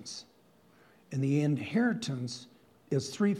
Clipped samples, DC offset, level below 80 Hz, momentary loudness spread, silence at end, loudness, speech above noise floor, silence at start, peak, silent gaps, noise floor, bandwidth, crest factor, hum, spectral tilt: under 0.1%; under 0.1%; -78 dBFS; 14 LU; 0 s; -32 LUFS; 33 dB; 0 s; -16 dBFS; none; -63 dBFS; 12.5 kHz; 16 dB; none; -6 dB/octave